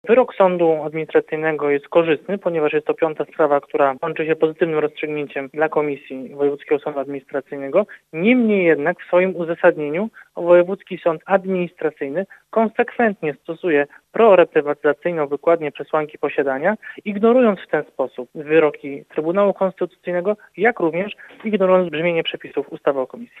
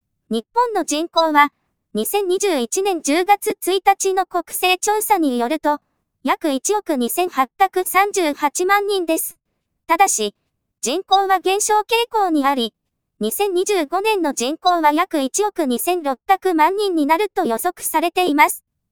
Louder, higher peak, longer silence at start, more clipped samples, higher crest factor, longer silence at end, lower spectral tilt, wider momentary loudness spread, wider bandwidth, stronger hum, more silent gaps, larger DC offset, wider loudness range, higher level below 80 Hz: about the same, -19 LUFS vs -18 LUFS; about the same, 0 dBFS vs 0 dBFS; second, 0.05 s vs 0.3 s; neither; about the same, 18 dB vs 18 dB; second, 0.15 s vs 0.3 s; first, -8 dB/octave vs -1.5 dB/octave; first, 11 LU vs 7 LU; second, 4 kHz vs over 20 kHz; neither; neither; second, under 0.1% vs 0.2%; about the same, 3 LU vs 1 LU; second, -70 dBFS vs -64 dBFS